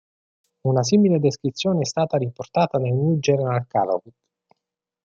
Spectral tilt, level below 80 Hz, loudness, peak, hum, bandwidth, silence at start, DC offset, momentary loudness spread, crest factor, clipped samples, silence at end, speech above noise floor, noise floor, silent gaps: -6.5 dB/octave; -62 dBFS; -21 LUFS; -6 dBFS; none; 7.8 kHz; 0.65 s; under 0.1%; 8 LU; 16 dB; under 0.1%; 1.05 s; 64 dB; -84 dBFS; none